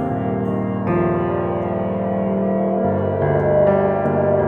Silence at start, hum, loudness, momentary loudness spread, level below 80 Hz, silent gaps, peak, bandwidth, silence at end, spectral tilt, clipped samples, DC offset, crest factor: 0 s; none; -19 LUFS; 6 LU; -46 dBFS; none; -4 dBFS; 3.8 kHz; 0 s; -11 dB/octave; under 0.1%; under 0.1%; 14 dB